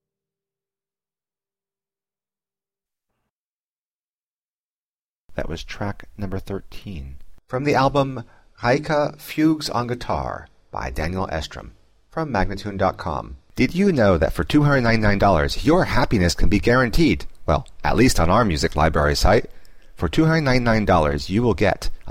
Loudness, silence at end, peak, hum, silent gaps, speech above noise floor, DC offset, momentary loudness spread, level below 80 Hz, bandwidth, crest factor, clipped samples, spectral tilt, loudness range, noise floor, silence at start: -20 LUFS; 0 s; -6 dBFS; none; none; over 71 dB; under 0.1%; 15 LU; -32 dBFS; 16.5 kHz; 16 dB; under 0.1%; -6 dB/octave; 15 LU; under -90 dBFS; 5.3 s